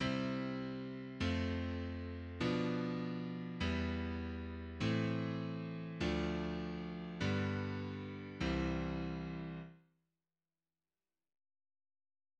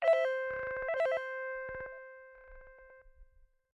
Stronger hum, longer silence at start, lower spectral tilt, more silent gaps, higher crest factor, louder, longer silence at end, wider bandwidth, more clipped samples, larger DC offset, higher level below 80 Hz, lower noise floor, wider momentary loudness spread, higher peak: neither; about the same, 0 s vs 0 s; first, -7 dB/octave vs -3.5 dB/octave; neither; about the same, 18 dB vs 16 dB; second, -40 LUFS vs -35 LUFS; first, 2.65 s vs 0.5 s; about the same, 8.8 kHz vs 9.2 kHz; neither; neither; first, -54 dBFS vs -64 dBFS; first, under -90 dBFS vs -63 dBFS; second, 8 LU vs 25 LU; second, -24 dBFS vs -20 dBFS